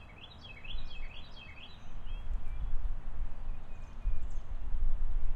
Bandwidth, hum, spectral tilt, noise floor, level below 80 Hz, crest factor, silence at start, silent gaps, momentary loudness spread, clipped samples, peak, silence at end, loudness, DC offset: 4.2 kHz; none; -6 dB/octave; -49 dBFS; -34 dBFS; 14 dB; 0 s; none; 10 LU; under 0.1%; -16 dBFS; 0 s; -44 LUFS; under 0.1%